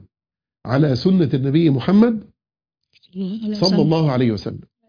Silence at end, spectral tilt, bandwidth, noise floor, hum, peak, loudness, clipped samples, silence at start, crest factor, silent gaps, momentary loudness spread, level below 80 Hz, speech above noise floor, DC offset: 0.25 s; -8 dB/octave; 5.2 kHz; under -90 dBFS; none; -2 dBFS; -18 LUFS; under 0.1%; 0.65 s; 16 dB; none; 13 LU; -52 dBFS; over 73 dB; under 0.1%